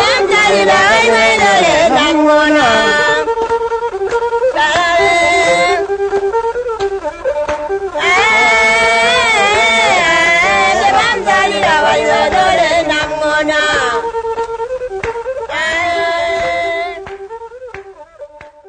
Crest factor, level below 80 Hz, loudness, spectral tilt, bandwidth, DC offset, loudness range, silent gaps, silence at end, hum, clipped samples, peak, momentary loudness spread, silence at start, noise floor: 12 dB; -40 dBFS; -11 LUFS; -2.5 dB/octave; 9.6 kHz; under 0.1%; 8 LU; none; 0.2 s; none; under 0.1%; 0 dBFS; 11 LU; 0 s; -34 dBFS